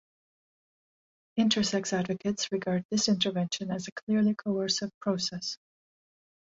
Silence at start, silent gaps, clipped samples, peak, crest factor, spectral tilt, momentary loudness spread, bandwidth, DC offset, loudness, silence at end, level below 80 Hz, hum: 1.35 s; 2.85-2.89 s, 3.92-3.96 s, 4.02-4.07 s, 4.94-5.01 s; under 0.1%; -12 dBFS; 20 dB; -4 dB/octave; 10 LU; 7.8 kHz; under 0.1%; -29 LUFS; 1 s; -68 dBFS; none